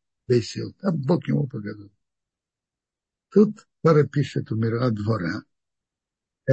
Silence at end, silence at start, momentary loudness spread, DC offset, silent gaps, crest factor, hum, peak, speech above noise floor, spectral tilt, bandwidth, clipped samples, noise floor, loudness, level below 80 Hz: 0 s; 0.3 s; 13 LU; under 0.1%; none; 20 dB; none; -4 dBFS; 66 dB; -8 dB/octave; 8.4 kHz; under 0.1%; -89 dBFS; -23 LUFS; -64 dBFS